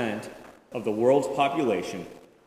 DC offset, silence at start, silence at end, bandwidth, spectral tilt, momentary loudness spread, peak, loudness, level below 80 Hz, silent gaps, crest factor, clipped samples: under 0.1%; 0 s; 0.3 s; 15.5 kHz; -5.5 dB/octave; 17 LU; -8 dBFS; -26 LUFS; -66 dBFS; none; 18 dB; under 0.1%